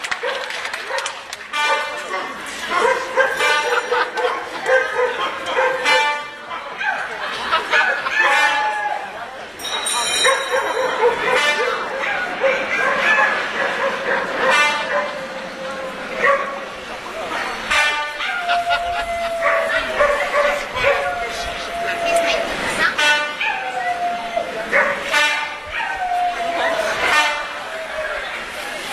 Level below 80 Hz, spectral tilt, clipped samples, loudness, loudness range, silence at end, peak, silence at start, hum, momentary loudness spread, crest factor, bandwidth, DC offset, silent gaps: -50 dBFS; -1 dB/octave; under 0.1%; -19 LUFS; 3 LU; 0 s; -2 dBFS; 0 s; none; 11 LU; 18 dB; 14 kHz; under 0.1%; none